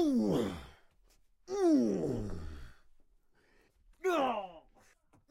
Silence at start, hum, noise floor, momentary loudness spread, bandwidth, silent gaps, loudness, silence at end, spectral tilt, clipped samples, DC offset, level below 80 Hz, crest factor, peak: 0 s; none; -68 dBFS; 20 LU; 15.5 kHz; none; -33 LUFS; 0.7 s; -6.5 dB/octave; under 0.1%; under 0.1%; -54 dBFS; 16 dB; -20 dBFS